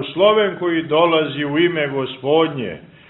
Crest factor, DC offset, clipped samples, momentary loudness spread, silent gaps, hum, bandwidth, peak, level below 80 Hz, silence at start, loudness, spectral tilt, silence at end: 16 dB; under 0.1%; under 0.1%; 8 LU; none; none; 4.1 kHz; -2 dBFS; -60 dBFS; 0 s; -17 LUFS; -10 dB/octave; 0.25 s